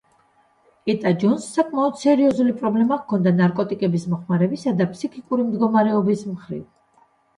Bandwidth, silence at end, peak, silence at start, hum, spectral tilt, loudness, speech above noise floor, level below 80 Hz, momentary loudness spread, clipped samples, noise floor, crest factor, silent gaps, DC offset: 11.5 kHz; 0.75 s; -6 dBFS; 0.85 s; none; -7.5 dB/octave; -20 LUFS; 40 dB; -64 dBFS; 8 LU; under 0.1%; -60 dBFS; 14 dB; none; under 0.1%